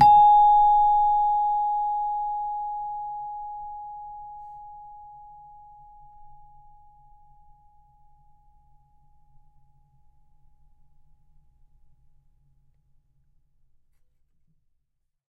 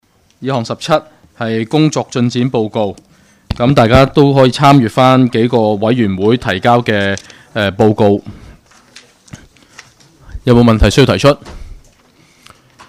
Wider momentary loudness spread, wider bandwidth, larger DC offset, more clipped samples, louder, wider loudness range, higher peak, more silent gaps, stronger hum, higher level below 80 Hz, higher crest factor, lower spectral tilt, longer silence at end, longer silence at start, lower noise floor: first, 28 LU vs 11 LU; second, 5.2 kHz vs 15 kHz; neither; second, under 0.1% vs 0.2%; second, -21 LUFS vs -12 LUFS; first, 27 LU vs 6 LU; second, -6 dBFS vs 0 dBFS; neither; neither; second, -52 dBFS vs -30 dBFS; first, 22 dB vs 12 dB; about the same, -5.5 dB/octave vs -6.5 dB/octave; first, 9.05 s vs 1.1 s; second, 0 s vs 0.4 s; first, -76 dBFS vs -48 dBFS